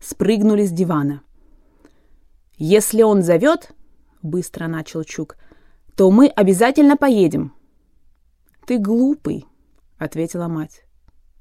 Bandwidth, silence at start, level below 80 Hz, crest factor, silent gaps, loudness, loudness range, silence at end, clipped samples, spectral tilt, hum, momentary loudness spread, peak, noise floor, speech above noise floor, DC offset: 16 kHz; 0.05 s; -52 dBFS; 16 dB; none; -17 LUFS; 7 LU; 0.75 s; under 0.1%; -6 dB/octave; none; 18 LU; -2 dBFS; -56 dBFS; 40 dB; under 0.1%